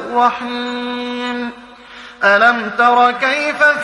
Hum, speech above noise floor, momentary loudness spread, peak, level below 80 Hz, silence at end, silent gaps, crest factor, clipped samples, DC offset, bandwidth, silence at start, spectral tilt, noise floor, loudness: none; 23 dB; 13 LU; 0 dBFS; -58 dBFS; 0 s; none; 16 dB; under 0.1%; under 0.1%; 11 kHz; 0 s; -3.5 dB/octave; -37 dBFS; -15 LUFS